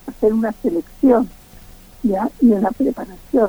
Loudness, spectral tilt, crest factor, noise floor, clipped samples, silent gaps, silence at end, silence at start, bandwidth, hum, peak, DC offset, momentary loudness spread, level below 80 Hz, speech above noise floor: -18 LUFS; -8.5 dB/octave; 14 dB; -42 dBFS; under 0.1%; none; 0 s; 0.05 s; over 20 kHz; none; -4 dBFS; under 0.1%; 8 LU; -44 dBFS; 25 dB